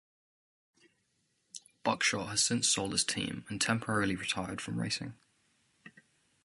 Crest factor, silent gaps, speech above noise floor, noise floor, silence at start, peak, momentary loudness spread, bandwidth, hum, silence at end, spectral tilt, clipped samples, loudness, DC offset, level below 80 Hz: 22 dB; none; 44 dB; -77 dBFS; 1.55 s; -12 dBFS; 11 LU; 12 kHz; none; 0.55 s; -2.5 dB/octave; under 0.1%; -31 LUFS; under 0.1%; -64 dBFS